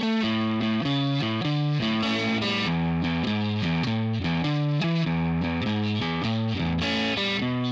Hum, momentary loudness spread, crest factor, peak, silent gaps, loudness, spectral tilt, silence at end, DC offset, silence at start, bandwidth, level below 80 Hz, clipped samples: none; 2 LU; 10 dB; -16 dBFS; none; -25 LUFS; -6.5 dB/octave; 0 s; under 0.1%; 0 s; 7.8 kHz; -48 dBFS; under 0.1%